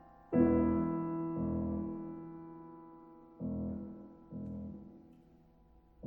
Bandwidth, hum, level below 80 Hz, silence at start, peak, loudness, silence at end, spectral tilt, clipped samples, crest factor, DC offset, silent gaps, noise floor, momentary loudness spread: 2.8 kHz; none; -54 dBFS; 0.05 s; -16 dBFS; -36 LUFS; 0 s; -12.5 dB/octave; under 0.1%; 22 dB; under 0.1%; none; -64 dBFS; 23 LU